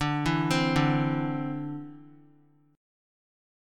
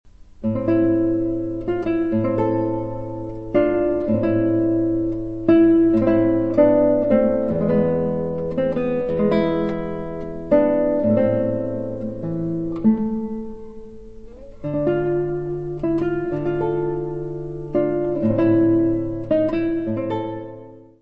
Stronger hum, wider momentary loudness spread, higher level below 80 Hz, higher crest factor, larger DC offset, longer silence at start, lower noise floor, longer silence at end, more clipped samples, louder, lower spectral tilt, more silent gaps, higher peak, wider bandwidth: neither; about the same, 14 LU vs 12 LU; second, -52 dBFS vs -42 dBFS; about the same, 20 dB vs 18 dB; second, under 0.1% vs 1%; about the same, 0 s vs 0.05 s; first, -61 dBFS vs -41 dBFS; first, 1.6 s vs 0 s; neither; second, -27 LUFS vs -20 LUFS; second, -6 dB/octave vs -10.5 dB/octave; neither; second, -10 dBFS vs -2 dBFS; first, 14.5 kHz vs 5.2 kHz